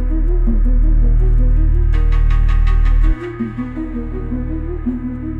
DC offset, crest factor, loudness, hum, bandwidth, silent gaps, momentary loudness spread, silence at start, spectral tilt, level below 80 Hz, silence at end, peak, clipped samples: under 0.1%; 8 dB; -19 LUFS; none; 3.3 kHz; none; 8 LU; 0 s; -9.5 dB/octave; -14 dBFS; 0 s; -4 dBFS; under 0.1%